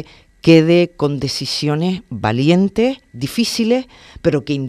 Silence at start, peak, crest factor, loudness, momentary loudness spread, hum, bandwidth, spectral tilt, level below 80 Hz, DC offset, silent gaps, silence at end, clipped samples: 0 s; 0 dBFS; 16 dB; -16 LUFS; 10 LU; none; 14.5 kHz; -6 dB/octave; -46 dBFS; under 0.1%; none; 0 s; under 0.1%